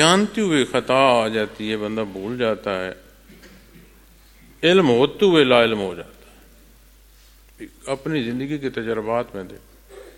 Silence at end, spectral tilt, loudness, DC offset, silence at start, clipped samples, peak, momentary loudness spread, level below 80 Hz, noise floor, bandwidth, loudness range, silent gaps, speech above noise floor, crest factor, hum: 0.05 s; -4.5 dB/octave; -20 LUFS; under 0.1%; 0 s; under 0.1%; 0 dBFS; 17 LU; -52 dBFS; -50 dBFS; 17 kHz; 9 LU; none; 30 dB; 22 dB; none